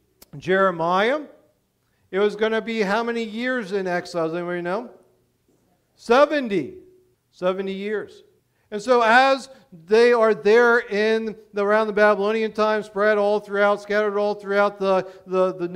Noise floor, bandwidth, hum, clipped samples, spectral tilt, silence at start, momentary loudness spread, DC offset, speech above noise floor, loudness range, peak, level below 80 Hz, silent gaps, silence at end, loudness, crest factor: -67 dBFS; 12 kHz; none; under 0.1%; -5.5 dB/octave; 0.35 s; 12 LU; under 0.1%; 47 dB; 6 LU; -2 dBFS; -64 dBFS; none; 0 s; -21 LUFS; 18 dB